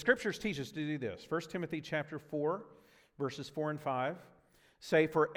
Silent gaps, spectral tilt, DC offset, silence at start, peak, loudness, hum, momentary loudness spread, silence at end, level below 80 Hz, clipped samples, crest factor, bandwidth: none; -5.5 dB/octave; under 0.1%; 0 s; -14 dBFS; -36 LUFS; none; 10 LU; 0 s; -70 dBFS; under 0.1%; 22 dB; 16 kHz